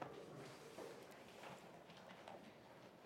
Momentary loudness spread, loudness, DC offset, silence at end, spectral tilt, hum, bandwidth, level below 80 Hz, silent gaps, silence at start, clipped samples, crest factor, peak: 5 LU; -58 LUFS; under 0.1%; 0 s; -4.5 dB/octave; none; 16.5 kHz; -88 dBFS; none; 0 s; under 0.1%; 24 dB; -34 dBFS